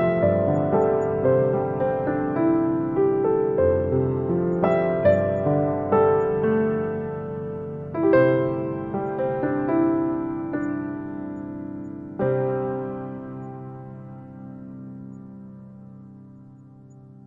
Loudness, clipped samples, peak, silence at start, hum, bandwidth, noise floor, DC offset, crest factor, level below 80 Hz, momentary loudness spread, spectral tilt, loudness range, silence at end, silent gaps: -23 LUFS; under 0.1%; -6 dBFS; 0 s; none; 7.2 kHz; -46 dBFS; under 0.1%; 18 dB; -54 dBFS; 19 LU; -10.5 dB/octave; 15 LU; 0.1 s; none